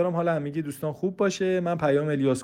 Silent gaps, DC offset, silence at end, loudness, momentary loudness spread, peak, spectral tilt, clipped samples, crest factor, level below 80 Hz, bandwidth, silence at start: none; under 0.1%; 0 s; -26 LUFS; 7 LU; -12 dBFS; -6.5 dB/octave; under 0.1%; 14 dB; -62 dBFS; 16.5 kHz; 0 s